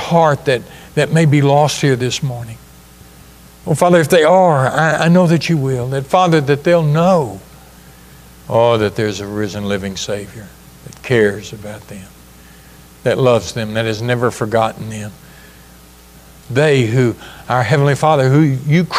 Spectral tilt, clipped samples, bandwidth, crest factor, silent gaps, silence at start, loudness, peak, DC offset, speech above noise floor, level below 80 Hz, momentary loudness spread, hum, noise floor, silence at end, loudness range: -6 dB/octave; under 0.1%; 15.5 kHz; 14 dB; none; 0 s; -14 LUFS; 0 dBFS; under 0.1%; 28 dB; -46 dBFS; 17 LU; none; -41 dBFS; 0 s; 8 LU